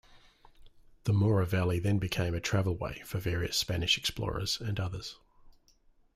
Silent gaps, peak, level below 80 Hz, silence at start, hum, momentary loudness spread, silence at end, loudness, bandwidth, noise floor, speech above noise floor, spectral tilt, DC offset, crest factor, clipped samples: none; -14 dBFS; -50 dBFS; 0.15 s; none; 9 LU; 0.65 s; -31 LUFS; 15.5 kHz; -64 dBFS; 34 dB; -5 dB/octave; under 0.1%; 18 dB; under 0.1%